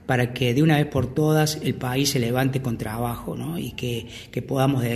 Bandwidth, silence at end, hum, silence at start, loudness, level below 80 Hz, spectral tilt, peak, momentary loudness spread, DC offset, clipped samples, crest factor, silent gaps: 13 kHz; 0 s; none; 0.05 s; -23 LUFS; -48 dBFS; -5.5 dB/octave; -6 dBFS; 10 LU; under 0.1%; under 0.1%; 16 dB; none